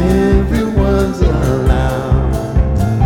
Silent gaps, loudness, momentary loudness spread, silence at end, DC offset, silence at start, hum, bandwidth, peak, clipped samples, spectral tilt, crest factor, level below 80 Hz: none; -14 LUFS; 3 LU; 0 s; under 0.1%; 0 s; none; 15.5 kHz; 0 dBFS; under 0.1%; -8 dB/octave; 12 dB; -16 dBFS